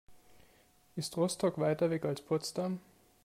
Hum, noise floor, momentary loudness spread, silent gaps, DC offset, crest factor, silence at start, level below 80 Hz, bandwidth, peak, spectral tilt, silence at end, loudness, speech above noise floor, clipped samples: none; -66 dBFS; 9 LU; none; under 0.1%; 16 dB; 0.1 s; -72 dBFS; 16 kHz; -20 dBFS; -5.5 dB/octave; 0.45 s; -34 LUFS; 32 dB; under 0.1%